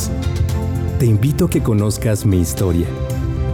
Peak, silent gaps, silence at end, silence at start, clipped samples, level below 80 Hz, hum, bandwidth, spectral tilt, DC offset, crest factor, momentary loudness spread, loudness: -6 dBFS; none; 0 s; 0 s; under 0.1%; -28 dBFS; none; 17.5 kHz; -6.5 dB/octave; under 0.1%; 10 dB; 5 LU; -18 LUFS